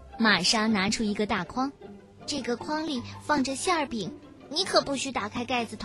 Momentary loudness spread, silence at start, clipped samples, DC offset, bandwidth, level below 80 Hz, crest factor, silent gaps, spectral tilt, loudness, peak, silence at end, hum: 12 LU; 0 s; under 0.1%; under 0.1%; 12.5 kHz; -54 dBFS; 20 dB; none; -3 dB/octave; -27 LUFS; -8 dBFS; 0 s; none